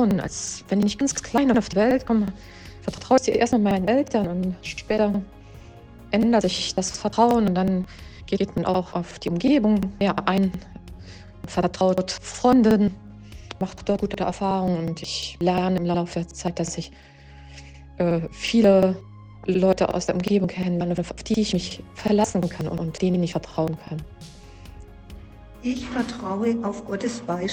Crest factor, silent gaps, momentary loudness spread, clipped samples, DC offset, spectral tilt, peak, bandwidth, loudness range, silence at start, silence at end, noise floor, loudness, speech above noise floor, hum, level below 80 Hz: 18 dB; none; 16 LU; under 0.1%; under 0.1%; -5.5 dB/octave; -4 dBFS; 11.5 kHz; 5 LU; 0 s; 0 s; -44 dBFS; -23 LUFS; 22 dB; none; -46 dBFS